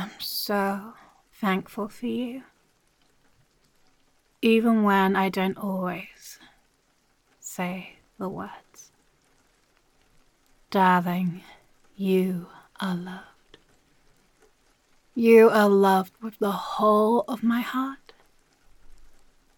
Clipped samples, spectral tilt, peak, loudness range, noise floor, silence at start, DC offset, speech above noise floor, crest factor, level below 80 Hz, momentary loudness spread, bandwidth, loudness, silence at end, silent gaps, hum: under 0.1%; -6 dB/octave; -6 dBFS; 17 LU; -67 dBFS; 0 s; under 0.1%; 44 dB; 22 dB; -64 dBFS; 22 LU; 17.5 kHz; -24 LUFS; 0.5 s; none; none